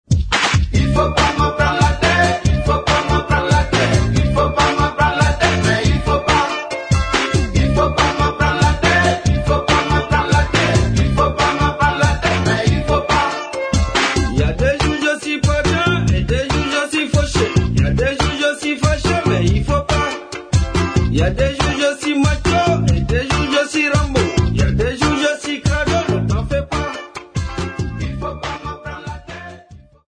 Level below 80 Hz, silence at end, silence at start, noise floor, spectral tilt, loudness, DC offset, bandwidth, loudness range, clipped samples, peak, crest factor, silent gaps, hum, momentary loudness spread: -24 dBFS; 0.3 s; 0.1 s; -42 dBFS; -5 dB/octave; -16 LUFS; under 0.1%; 10.5 kHz; 3 LU; under 0.1%; 0 dBFS; 16 dB; none; none; 8 LU